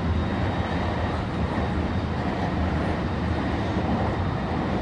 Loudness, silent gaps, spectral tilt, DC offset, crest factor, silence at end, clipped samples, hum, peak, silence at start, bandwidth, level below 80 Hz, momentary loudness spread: -26 LUFS; none; -7.5 dB/octave; under 0.1%; 12 dB; 0 s; under 0.1%; none; -12 dBFS; 0 s; 9.4 kHz; -32 dBFS; 2 LU